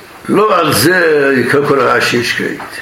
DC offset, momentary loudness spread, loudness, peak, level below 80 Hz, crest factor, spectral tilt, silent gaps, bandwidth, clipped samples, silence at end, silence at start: under 0.1%; 6 LU; -11 LUFS; 0 dBFS; -50 dBFS; 12 dB; -4 dB/octave; none; 16.5 kHz; under 0.1%; 0 s; 0 s